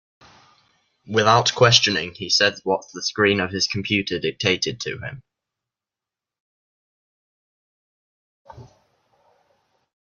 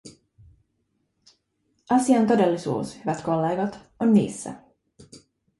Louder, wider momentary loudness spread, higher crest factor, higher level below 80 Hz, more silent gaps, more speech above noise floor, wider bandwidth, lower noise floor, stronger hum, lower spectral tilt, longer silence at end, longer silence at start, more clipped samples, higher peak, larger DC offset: first, -19 LUFS vs -23 LUFS; about the same, 12 LU vs 12 LU; first, 24 dB vs 18 dB; about the same, -60 dBFS vs -62 dBFS; first, 6.40-8.45 s vs none; first, 69 dB vs 51 dB; second, 7.4 kHz vs 11.5 kHz; first, -89 dBFS vs -73 dBFS; neither; second, -3 dB/octave vs -6.5 dB/octave; first, 1.45 s vs 0.45 s; first, 1.05 s vs 0.05 s; neither; first, 0 dBFS vs -6 dBFS; neither